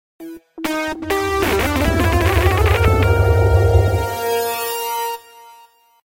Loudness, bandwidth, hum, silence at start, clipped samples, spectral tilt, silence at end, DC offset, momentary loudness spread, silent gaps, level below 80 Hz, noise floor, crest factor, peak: -17 LUFS; 17 kHz; none; 0.2 s; under 0.1%; -5.5 dB/octave; 0.85 s; under 0.1%; 12 LU; none; -24 dBFS; -49 dBFS; 16 dB; -2 dBFS